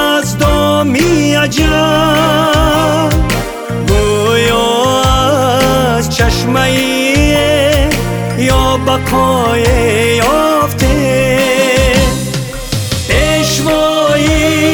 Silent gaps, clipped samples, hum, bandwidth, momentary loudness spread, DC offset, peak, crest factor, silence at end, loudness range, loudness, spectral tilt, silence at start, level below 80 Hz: none; under 0.1%; none; over 20 kHz; 4 LU; 0.2%; 0 dBFS; 10 dB; 0 s; 1 LU; -11 LUFS; -4.5 dB/octave; 0 s; -20 dBFS